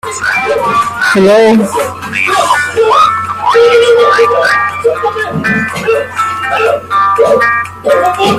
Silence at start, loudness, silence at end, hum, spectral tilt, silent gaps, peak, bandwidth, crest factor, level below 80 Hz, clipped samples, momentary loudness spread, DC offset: 0.05 s; -9 LUFS; 0 s; none; -4 dB/octave; none; 0 dBFS; 14 kHz; 10 dB; -48 dBFS; under 0.1%; 7 LU; under 0.1%